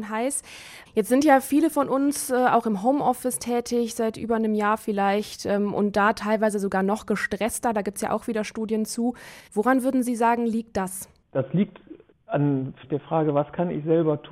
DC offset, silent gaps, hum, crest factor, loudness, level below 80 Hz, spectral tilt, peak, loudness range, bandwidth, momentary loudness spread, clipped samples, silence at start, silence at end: under 0.1%; none; none; 18 dB; -24 LUFS; -58 dBFS; -5.5 dB/octave; -6 dBFS; 4 LU; 16 kHz; 8 LU; under 0.1%; 0 s; 0 s